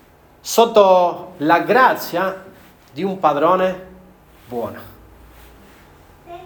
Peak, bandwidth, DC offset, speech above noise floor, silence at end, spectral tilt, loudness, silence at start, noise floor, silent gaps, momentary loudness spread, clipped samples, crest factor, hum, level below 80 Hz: 0 dBFS; over 20 kHz; under 0.1%; 30 dB; 0 s; -4.5 dB/octave; -16 LUFS; 0.45 s; -46 dBFS; none; 21 LU; under 0.1%; 18 dB; none; -54 dBFS